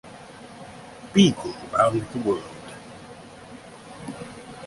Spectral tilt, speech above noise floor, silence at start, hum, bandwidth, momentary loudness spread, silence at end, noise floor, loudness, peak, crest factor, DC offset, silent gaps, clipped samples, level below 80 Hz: -5.5 dB/octave; 22 dB; 0.05 s; none; 11.5 kHz; 24 LU; 0 s; -43 dBFS; -23 LUFS; -4 dBFS; 22 dB; under 0.1%; none; under 0.1%; -56 dBFS